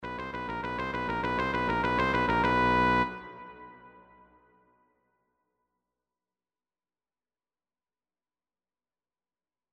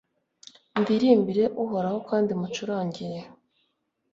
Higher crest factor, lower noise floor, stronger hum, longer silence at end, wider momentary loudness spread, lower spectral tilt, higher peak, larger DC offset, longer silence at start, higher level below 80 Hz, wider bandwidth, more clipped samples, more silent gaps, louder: about the same, 20 dB vs 20 dB; first, under -90 dBFS vs -75 dBFS; neither; first, 5.85 s vs 0.85 s; first, 20 LU vs 13 LU; about the same, -6.5 dB/octave vs -6.5 dB/octave; second, -14 dBFS vs -6 dBFS; neither; second, 0 s vs 0.75 s; first, -50 dBFS vs -68 dBFS; first, 10 kHz vs 7.6 kHz; neither; neither; second, -28 LUFS vs -25 LUFS